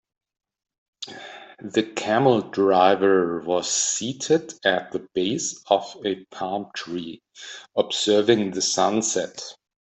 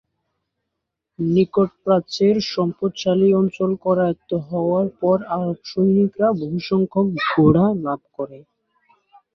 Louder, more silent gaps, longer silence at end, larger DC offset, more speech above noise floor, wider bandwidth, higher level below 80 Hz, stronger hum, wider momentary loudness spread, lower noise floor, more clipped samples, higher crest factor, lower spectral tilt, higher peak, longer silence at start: second, -22 LUFS vs -19 LUFS; neither; second, 0.3 s vs 0.95 s; neither; second, 18 dB vs 61 dB; first, 8.4 kHz vs 7 kHz; second, -68 dBFS vs -56 dBFS; neither; first, 19 LU vs 9 LU; second, -41 dBFS vs -80 dBFS; neither; about the same, 20 dB vs 18 dB; second, -3 dB/octave vs -7.5 dB/octave; about the same, -4 dBFS vs -2 dBFS; second, 1 s vs 1.2 s